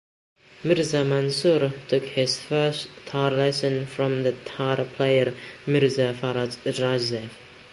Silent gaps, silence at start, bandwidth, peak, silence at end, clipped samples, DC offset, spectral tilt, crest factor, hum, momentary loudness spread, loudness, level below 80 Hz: none; 0.6 s; 11.5 kHz; -8 dBFS; 0.05 s; under 0.1%; under 0.1%; -5.5 dB/octave; 16 dB; none; 7 LU; -24 LUFS; -62 dBFS